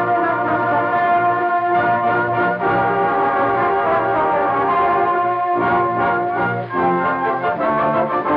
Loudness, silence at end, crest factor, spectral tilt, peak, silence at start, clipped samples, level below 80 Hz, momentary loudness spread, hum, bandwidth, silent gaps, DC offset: -17 LUFS; 0 s; 10 dB; -9 dB/octave; -8 dBFS; 0 s; under 0.1%; -52 dBFS; 2 LU; none; 5.2 kHz; none; under 0.1%